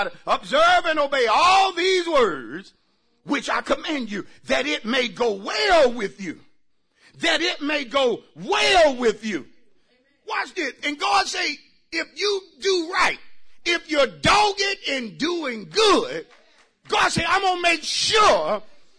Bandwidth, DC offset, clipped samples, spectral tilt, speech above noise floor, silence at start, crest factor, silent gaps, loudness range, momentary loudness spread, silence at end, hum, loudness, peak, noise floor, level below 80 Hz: 10.5 kHz; under 0.1%; under 0.1%; -2.5 dB/octave; 43 dB; 0 s; 14 dB; none; 4 LU; 13 LU; 0.15 s; none; -21 LUFS; -8 dBFS; -64 dBFS; -50 dBFS